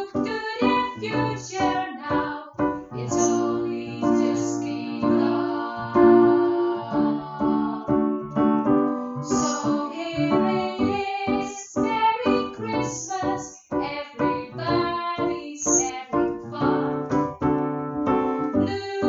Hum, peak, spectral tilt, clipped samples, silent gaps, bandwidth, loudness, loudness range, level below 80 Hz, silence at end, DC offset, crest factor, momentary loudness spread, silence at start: none; -4 dBFS; -5 dB/octave; under 0.1%; none; 7.8 kHz; -24 LUFS; 4 LU; -52 dBFS; 0 s; under 0.1%; 18 dB; 7 LU; 0 s